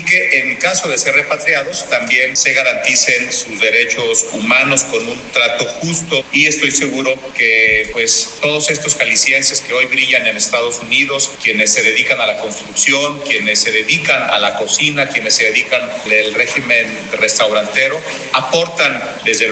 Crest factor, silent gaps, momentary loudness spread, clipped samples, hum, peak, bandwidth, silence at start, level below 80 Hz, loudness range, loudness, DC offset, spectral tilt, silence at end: 14 dB; none; 6 LU; under 0.1%; none; 0 dBFS; 9.4 kHz; 0 s; -52 dBFS; 2 LU; -12 LUFS; under 0.1%; -1 dB/octave; 0 s